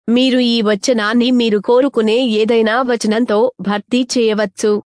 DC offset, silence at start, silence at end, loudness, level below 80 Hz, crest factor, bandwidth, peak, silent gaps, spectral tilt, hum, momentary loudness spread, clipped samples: under 0.1%; 0.05 s; 0.1 s; -14 LUFS; -60 dBFS; 10 dB; 10.5 kHz; -2 dBFS; none; -4.5 dB/octave; none; 4 LU; under 0.1%